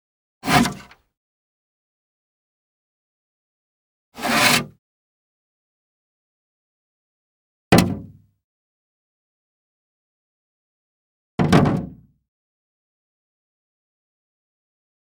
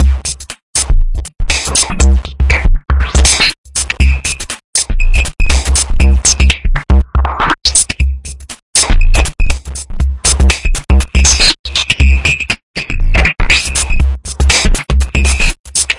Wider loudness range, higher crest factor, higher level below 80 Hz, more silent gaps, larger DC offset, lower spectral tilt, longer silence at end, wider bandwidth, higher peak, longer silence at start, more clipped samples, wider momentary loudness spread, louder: about the same, 3 LU vs 2 LU; first, 26 dB vs 10 dB; second, -48 dBFS vs -12 dBFS; first, 1.17-4.12 s, 4.79-7.71 s, 8.44-11.38 s vs 0.62-0.73 s, 3.58-3.64 s, 4.64-4.73 s, 8.62-8.73 s, 11.59-11.64 s, 12.63-12.74 s, 15.60-15.64 s; neither; first, -4.5 dB/octave vs -2.5 dB/octave; first, 3.2 s vs 0 s; first, over 20 kHz vs 11.5 kHz; about the same, 0 dBFS vs 0 dBFS; first, 0.45 s vs 0 s; neither; first, 18 LU vs 9 LU; second, -18 LUFS vs -12 LUFS